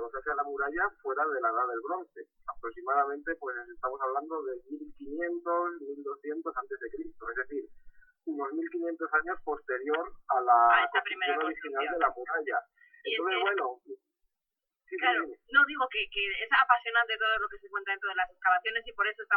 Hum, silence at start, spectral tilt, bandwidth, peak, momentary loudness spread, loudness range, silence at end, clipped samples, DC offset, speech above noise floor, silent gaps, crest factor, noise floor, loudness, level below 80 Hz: none; 0 s; -5 dB/octave; 4.7 kHz; -8 dBFS; 15 LU; 8 LU; 0 s; under 0.1%; under 0.1%; 58 dB; none; 24 dB; -89 dBFS; -30 LUFS; -62 dBFS